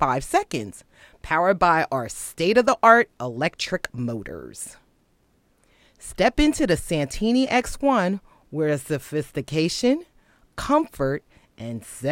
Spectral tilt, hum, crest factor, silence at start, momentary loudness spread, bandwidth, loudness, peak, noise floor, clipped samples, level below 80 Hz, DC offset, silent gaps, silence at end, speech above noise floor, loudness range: -5 dB/octave; none; 22 dB; 0 s; 16 LU; 16.5 kHz; -22 LUFS; 0 dBFS; -64 dBFS; under 0.1%; -42 dBFS; under 0.1%; none; 0 s; 41 dB; 6 LU